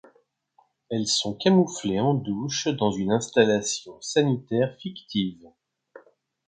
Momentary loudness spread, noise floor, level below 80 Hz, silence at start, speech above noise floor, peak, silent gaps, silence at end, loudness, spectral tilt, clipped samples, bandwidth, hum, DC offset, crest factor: 9 LU; -65 dBFS; -62 dBFS; 0.9 s; 41 dB; -6 dBFS; none; 0.5 s; -24 LUFS; -4.5 dB/octave; under 0.1%; 9.6 kHz; none; under 0.1%; 20 dB